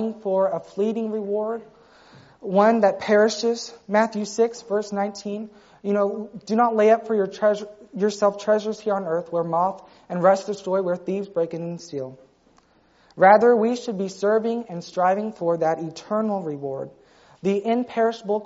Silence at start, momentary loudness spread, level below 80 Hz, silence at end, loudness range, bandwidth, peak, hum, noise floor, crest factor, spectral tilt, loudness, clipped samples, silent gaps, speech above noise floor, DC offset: 0 s; 14 LU; -70 dBFS; 0 s; 4 LU; 8 kHz; -2 dBFS; none; -59 dBFS; 20 dB; -5 dB/octave; -22 LUFS; under 0.1%; none; 37 dB; under 0.1%